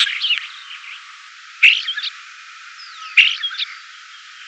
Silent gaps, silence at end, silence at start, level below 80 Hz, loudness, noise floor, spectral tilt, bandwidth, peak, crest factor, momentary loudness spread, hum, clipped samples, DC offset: none; 0 s; 0 s; under -90 dBFS; -15 LUFS; -40 dBFS; 12 dB/octave; 9 kHz; 0 dBFS; 20 dB; 26 LU; none; under 0.1%; under 0.1%